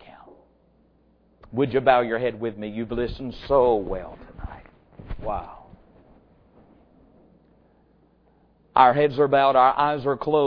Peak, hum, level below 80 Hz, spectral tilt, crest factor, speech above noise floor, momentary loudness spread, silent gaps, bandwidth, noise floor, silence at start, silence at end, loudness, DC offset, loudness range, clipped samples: -2 dBFS; none; -46 dBFS; -8.5 dB/octave; 22 dB; 39 dB; 23 LU; none; 5.4 kHz; -60 dBFS; 1.55 s; 0 s; -22 LUFS; under 0.1%; 18 LU; under 0.1%